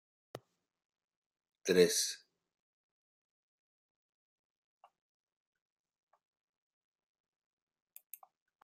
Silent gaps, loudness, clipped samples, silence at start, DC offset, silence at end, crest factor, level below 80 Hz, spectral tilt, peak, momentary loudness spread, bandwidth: 0.85-0.90 s, 1.04-1.08 s, 1.17-1.31 s; -31 LUFS; under 0.1%; 0.35 s; under 0.1%; 6.45 s; 30 dB; -88 dBFS; -3 dB/octave; -12 dBFS; 26 LU; 14 kHz